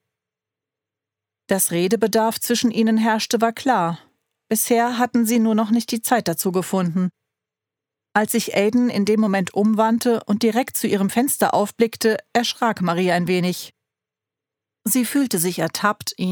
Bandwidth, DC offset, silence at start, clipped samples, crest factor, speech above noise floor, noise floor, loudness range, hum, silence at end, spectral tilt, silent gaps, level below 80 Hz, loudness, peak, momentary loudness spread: over 20 kHz; under 0.1%; 1.5 s; under 0.1%; 18 dB; 68 dB; -87 dBFS; 3 LU; none; 0 s; -4.5 dB/octave; none; -68 dBFS; -20 LUFS; -2 dBFS; 4 LU